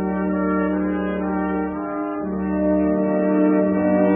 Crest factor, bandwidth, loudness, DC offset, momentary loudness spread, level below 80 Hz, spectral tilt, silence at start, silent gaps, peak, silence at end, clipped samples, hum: 12 dB; 3.5 kHz; -21 LUFS; under 0.1%; 8 LU; -44 dBFS; -13.5 dB/octave; 0 s; none; -8 dBFS; 0 s; under 0.1%; none